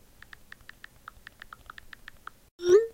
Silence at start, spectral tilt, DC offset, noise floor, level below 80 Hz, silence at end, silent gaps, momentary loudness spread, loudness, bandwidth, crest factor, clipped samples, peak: 2.6 s; -4.5 dB/octave; under 0.1%; -52 dBFS; -60 dBFS; 0.05 s; none; 24 LU; -25 LUFS; 16 kHz; 22 dB; under 0.1%; -10 dBFS